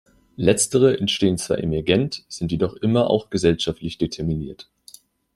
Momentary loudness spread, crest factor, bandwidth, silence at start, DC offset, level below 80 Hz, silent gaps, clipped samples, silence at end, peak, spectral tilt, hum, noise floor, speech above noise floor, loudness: 10 LU; 20 dB; 14.5 kHz; 0.4 s; under 0.1%; -46 dBFS; none; under 0.1%; 0.75 s; -2 dBFS; -5 dB/octave; none; -49 dBFS; 28 dB; -21 LUFS